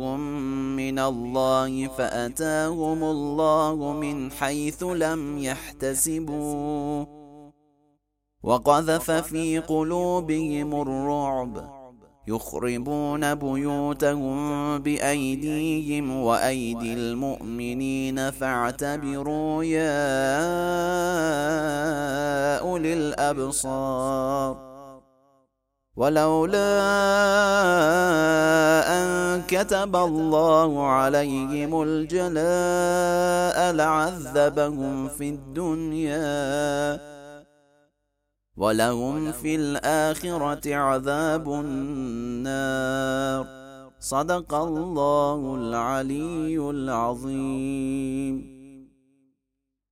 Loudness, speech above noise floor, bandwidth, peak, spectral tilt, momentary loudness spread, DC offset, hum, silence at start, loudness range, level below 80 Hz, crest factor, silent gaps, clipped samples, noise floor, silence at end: -24 LUFS; 58 dB; 16.5 kHz; -4 dBFS; -5 dB/octave; 9 LU; under 0.1%; none; 0 s; 7 LU; -50 dBFS; 20 dB; none; under 0.1%; -82 dBFS; 1.05 s